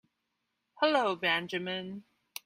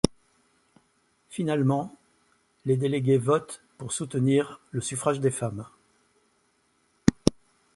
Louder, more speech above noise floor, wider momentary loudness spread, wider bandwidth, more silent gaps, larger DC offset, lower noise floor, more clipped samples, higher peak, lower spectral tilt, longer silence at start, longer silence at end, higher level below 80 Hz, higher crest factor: second, -30 LUFS vs -27 LUFS; first, 52 dB vs 43 dB; about the same, 18 LU vs 16 LU; first, 15.5 kHz vs 11.5 kHz; neither; neither; first, -82 dBFS vs -69 dBFS; neither; second, -14 dBFS vs -2 dBFS; second, -4 dB/octave vs -6 dB/octave; first, 0.8 s vs 0.05 s; about the same, 0.45 s vs 0.45 s; second, -78 dBFS vs -54 dBFS; second, 20 dB vs 28 dB